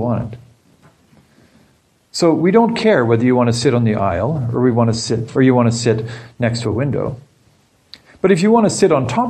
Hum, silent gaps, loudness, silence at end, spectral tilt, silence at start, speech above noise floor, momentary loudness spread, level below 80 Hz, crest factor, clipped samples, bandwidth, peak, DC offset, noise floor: none; none; -15 LUFS; 0 s; -6 dB/octave; 0 s; 41 dB; 9 LU; -48 dBFS; 16 dB; under 0.1%; 10 kHz; 0 dBFS; under 0.1%; -56 dBFS